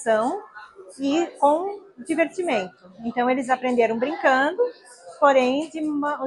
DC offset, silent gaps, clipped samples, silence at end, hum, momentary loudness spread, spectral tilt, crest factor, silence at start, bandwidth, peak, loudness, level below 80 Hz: under 0.1%; none; under 0.1%; 0 s; none; 14 LU; -4 dB/octave; 18 dB; 0 s; 11.5 kHz; -4 dBFS; -22 LUFS; -70 dBFS